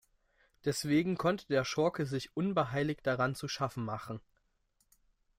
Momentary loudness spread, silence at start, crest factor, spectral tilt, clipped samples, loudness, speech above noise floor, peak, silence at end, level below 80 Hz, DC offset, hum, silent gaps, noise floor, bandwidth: 9 LU; 0.65 s; 18 dB; -5.5 dB/octave; under 0.1%; -33 LUFS; 43 dB; -16 dBFS; 1.2 s; -66 dBFS; under 0.1%; none; none; -76 dBFS; 16 kHz